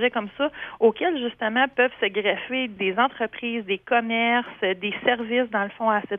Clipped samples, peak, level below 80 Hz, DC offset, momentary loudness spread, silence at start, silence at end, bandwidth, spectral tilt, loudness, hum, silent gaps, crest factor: under 0.1%; -6 dBFS; -66 dBFS; under 0.1%; 6 LU; 0 s; 0 s; 3.8 kHz; -7.5 dB/octave; -24 LUFS; none; none; 18 dB